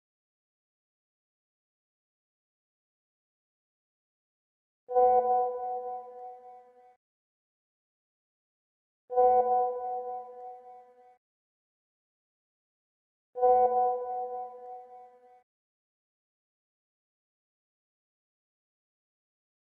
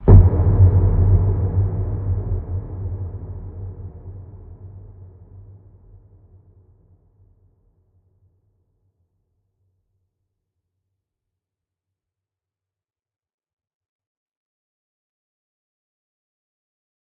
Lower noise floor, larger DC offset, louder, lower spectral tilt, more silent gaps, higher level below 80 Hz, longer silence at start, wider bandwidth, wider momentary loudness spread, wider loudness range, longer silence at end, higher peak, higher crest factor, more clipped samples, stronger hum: second, -54 dBFS vs -89 dBFS; neither; second, -28 LUFS vs -18 LUFS; second, -8 dB/octave vs -14 dB/octave; first, 6.96-9.08 s, 11.17-13.33 s vs none; second, -76 dBFS vs -28 dBFS; first, 4.9 s vs 0 s; first, 2.4 kHz vs 2 kHz; second, 22 LU vs 26 LU; second, 13 LU vs 26 LU; second, 4.65 s vs 11.65 s; second, -14 dBFS vs 0 dBFS; about the same, 20 dB vs 22 dB; neither; neither